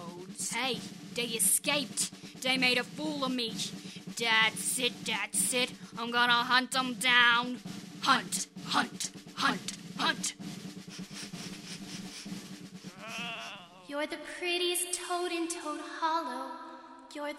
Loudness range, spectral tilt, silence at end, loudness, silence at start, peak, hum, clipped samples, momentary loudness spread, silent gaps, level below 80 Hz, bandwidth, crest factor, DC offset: 12 LU; -1.5 dB/octave; 0 s; -30 LUFS; 0 s; -8 dBFS; none; under 0.1%; 18 LU; none; -74 dBFS; 16 kHz; 24 dB; under 0.1%